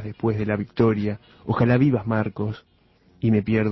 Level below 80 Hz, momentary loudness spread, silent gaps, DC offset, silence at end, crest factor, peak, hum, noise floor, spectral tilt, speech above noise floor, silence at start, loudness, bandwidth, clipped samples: -48 dBFS; 11 LU; none; under 0.1%; 0 s; 16 dB; -6 dBFS; none; -58 dBFS; -10.5 dB/octave; 36 dB; 0 s; -23 LUFS; 6 kHz; under 0.1%